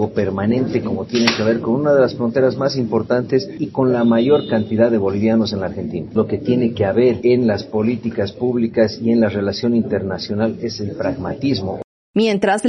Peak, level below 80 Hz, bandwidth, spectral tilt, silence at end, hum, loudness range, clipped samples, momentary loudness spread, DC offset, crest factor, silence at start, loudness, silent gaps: 0 dBFS; -50 dBFS; 6.4 kHz; -5.5 dB/octave; 0 s; none; 2 LU; under 0.1%; 8 LU; under 0.1%; 18 dB; 0 s; -18 LUFS; 11.84-12.14 s